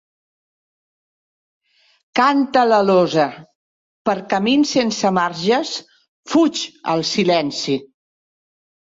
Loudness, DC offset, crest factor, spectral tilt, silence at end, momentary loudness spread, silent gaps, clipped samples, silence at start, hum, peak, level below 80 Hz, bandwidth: -18 LUFS; under 0.1%; 18 dB; -4.5 dB/octave; 1 s; 9 LU; 3.55-4.05 s, 6.08-6.23 s; under 0.1%; 2.15 s; none; -2 dBFS; -64 dBFS; 7.8 kHz